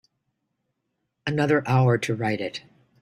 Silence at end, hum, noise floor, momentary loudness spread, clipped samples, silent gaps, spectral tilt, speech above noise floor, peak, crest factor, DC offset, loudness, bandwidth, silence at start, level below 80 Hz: 0.45 s; none; -78 dBFS; 13 LU; under 0.1%; none; -6.5 dB/octave; 55 dB; -8 dBFS; 18 dB; under 0.1%; -24 LUFS; 12.5 kHz; 1.25 s; -62 dBFS